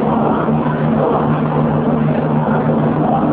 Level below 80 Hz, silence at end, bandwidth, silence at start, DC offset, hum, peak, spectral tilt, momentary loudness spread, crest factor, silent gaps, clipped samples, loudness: -38 dBFS; 0 s; 4 kHz; 0 s; under 0.1%; none; -4 dBFS; -12.5 dB/octave; 1 LU; 12 dB; none; under 0.1%; -15 LUFS